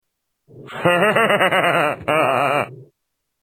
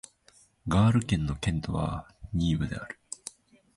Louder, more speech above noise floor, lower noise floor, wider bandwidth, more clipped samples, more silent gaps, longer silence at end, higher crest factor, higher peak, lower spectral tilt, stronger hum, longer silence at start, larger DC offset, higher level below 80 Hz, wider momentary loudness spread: first, -17 LUFS vs -29 LUFS; first, 59 dB vs 35 dB; first, -76 dBFS vs -62 dBFS; first, 15 kHz vs 11.5 kHz; neither; neither; first, 0.6 s vs 0.45 s; about the same, 18 dB vs 18 dB; first, 0 dBFS vs -12 dBFS; second, -4.5 dB/octave vs -6.5 dB/octave; neither; about the same, 0.55 s vs 0.65 s; neither; second, -62 dBFS vs -42 dBFS; second, 7 LU vs 17 LU